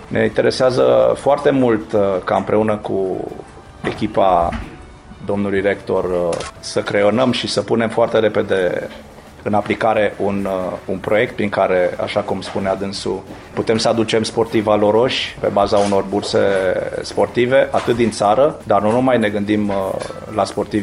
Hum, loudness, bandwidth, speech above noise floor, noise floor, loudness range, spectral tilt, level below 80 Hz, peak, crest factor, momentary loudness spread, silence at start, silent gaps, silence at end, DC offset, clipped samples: none; -17 LUFS; 11.5 kHz; 21 dB; -37 dBFS; 4 LU; -5.5 dB/octave; -44 dBFS; -4 dBFS; 14 dB; 9 LU; 0 s; none; 0 s; under 0.1%; under 0.1%